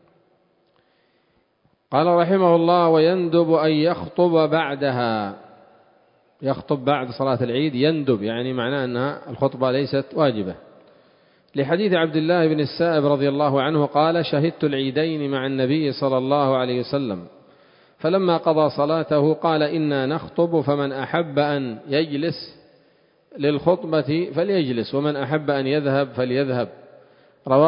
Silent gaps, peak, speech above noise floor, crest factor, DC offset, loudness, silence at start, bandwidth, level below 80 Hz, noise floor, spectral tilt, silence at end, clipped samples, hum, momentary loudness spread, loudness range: none; -2 dBFS; 44 dB; 18 dB; under 0.1%; -21 LUFS; 1.9 s; 5.4 kHz; -62 dBFS; -65 dBFS; -11.5 dB/octave; 0 s; under 0.1%; none; 8 LU; 5 LU